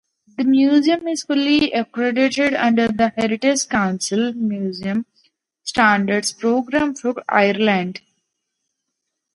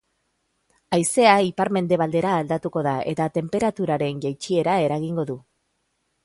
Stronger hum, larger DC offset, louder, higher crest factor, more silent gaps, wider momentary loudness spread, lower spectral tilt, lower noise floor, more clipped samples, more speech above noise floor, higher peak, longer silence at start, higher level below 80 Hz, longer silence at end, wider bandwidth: neither; neither; first, -18 LUFS vs -22 LUFS; about the same, 18 dB vs 20 dB; neither; about the same, 9 LU vs 10 LU; about the same, -4 dB/octave vs -5 dB/octave; first, -78 dBFS vs -72 dBFS; neither; first, 60 dB vs 51 dB; about the same, 0 dBFS vs -2 dBFS; second, 0.4 s vs 0.9 s; about the same, -56 dBFS vs -60 dBFS; first, 1.35 s vs 0.85 s; about the same, 11.5 kHz vs 11.5 kHz